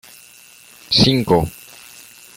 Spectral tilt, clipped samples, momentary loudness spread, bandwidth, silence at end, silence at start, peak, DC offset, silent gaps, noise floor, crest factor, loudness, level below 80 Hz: -5 dB/octave; under 0.1%; 25 LU; 17 kHz; 0.85 s; 0.9 s; 0 dBFS; under 0.1%; none; -45 dBFS; 20 dB; -16 LUFS; -42 dBFS